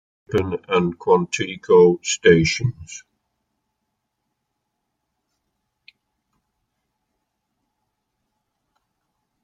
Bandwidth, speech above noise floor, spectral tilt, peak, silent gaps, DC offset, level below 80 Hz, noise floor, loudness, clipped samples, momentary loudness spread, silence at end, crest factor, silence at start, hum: 9.2 kHz; 59 dB; -5 dB/octave; -2 dBFS; none; under 0.1%; -54 dBFS; -77 dBFS; -18 LUFS; under 0.1%; 14 LU; 6.45 s; 22 dB; 0.3 s; none